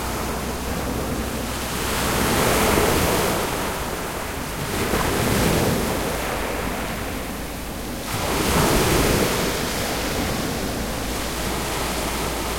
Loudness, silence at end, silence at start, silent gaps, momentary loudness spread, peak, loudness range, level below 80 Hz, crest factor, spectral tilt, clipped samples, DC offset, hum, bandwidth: -23 LUFS; 0 s; 0 s; none; 9 LU; -4 dBFS; 3 LU; -32 dBFS; 18 dB; -4 dB/octave; under 0.1%; under 0.1%; none; 16.5 kHz